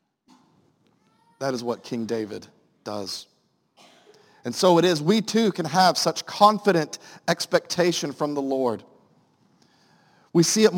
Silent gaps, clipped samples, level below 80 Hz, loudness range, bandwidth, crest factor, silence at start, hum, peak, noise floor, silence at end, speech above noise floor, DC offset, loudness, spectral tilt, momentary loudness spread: none; under 0.1%; -72 dBFS; 11 LU; 17 kHz; 22 dB; 1.4 s; none; -2 dBFS; -64 dBFS; 0 s; 42 dB; under 0.1%; -23 LUFS; -4 dB/octave; 15 LU